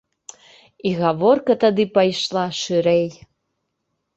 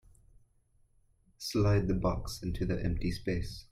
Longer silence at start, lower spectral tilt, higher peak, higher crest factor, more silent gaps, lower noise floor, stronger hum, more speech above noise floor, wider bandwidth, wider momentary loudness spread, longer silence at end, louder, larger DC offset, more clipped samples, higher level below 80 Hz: second, 0.85 s vs 1.4 s; about the same, -5.5 dB/octave vs -6.5 dB/octave; first, -2 dBFS vs -16 dBFS; about the same, 18 dB vs 18 dB; neither; first, -75 dBFS vs -68 dBFS; neither; first, 57 dB vs 37 dB; second, 8.2 kHz vs 15.5 kHz; about the same, 7 LU vs 9 LU; first, 1.05 s vs 0.1 s; first, -19 LUFS vs -33 LUFS; neither; neither; second, -62 dBFS vs -44 dBFS